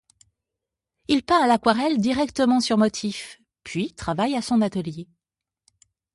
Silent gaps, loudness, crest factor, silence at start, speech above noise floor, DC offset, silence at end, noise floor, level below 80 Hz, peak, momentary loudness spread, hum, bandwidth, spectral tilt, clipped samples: none; -22 LUFS; 20 dB; 1.1 s; 66 dB; under 0.1%; 1.1 s; -88 dBFS; -54 dBFS; -4 dBFS; 16 LU; none; 11.5 kHz; -5 dB/octave; under 0.1%